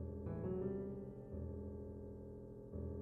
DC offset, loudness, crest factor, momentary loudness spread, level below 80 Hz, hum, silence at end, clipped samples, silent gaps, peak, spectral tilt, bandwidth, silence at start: under 0.1%; -48 LUFS; 16 dB; 10 LU; -60 dBFS; none; 0 s; under 0.1%; none; -30 dBFS; -12 dB/octave; 3 kHz; 0 s